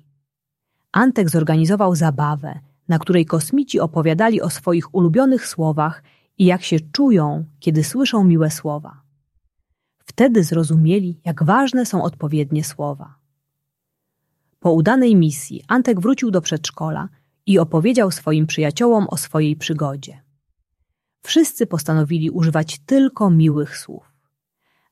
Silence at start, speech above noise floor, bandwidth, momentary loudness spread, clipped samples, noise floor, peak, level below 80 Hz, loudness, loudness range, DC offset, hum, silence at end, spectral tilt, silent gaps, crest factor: 0.95 s; 63 dB; 14.5 kHz; 10 LU; under 0.1%; -80 dBFS; -2 dBFS; -60 dBFS; -17 LUFS; 3 LU; under 0.1%; none; 0.95 s; -6 dB/octave; none; 16 dB